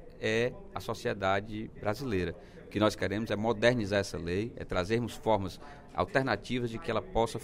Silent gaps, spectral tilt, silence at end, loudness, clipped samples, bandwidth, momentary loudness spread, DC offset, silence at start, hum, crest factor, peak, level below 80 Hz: none; -5.5 dB/octave; 0 s; -32 LUFS; under 0.1%; 16 kHz; 11 LU; under 0.1%; 0 s; none; 22 dB; -10 dBFS; -50 dBFS